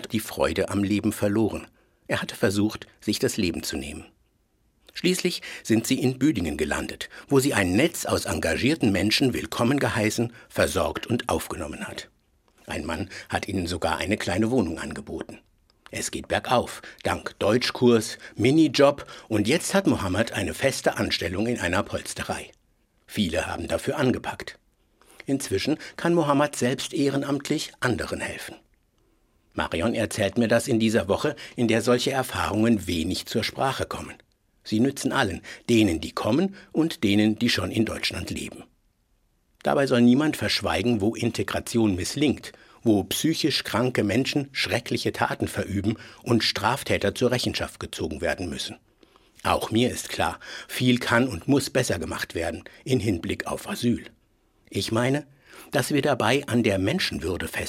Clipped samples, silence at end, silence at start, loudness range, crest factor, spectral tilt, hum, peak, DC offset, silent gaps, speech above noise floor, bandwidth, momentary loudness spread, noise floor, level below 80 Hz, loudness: under 0.1%; 0 s; 0 s; 5 LU; 20 dB; -5 dB/octave; none; -4 dBFS; under 0.1%; none; 42 dB; 16.5 kHz; 11 LU; -67 dBFS; -52 dBFS; -25 LUFS